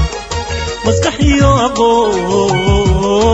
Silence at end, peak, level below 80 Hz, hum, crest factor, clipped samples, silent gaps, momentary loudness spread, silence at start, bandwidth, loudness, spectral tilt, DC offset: 0 s; 0 dBFS; -22 dBFS; none; 12 dB; under 0.1%; none; 8 LU; 0 s; 9.2 kHz; -12 LUFS; -5.5 dB/octave; under 0.1%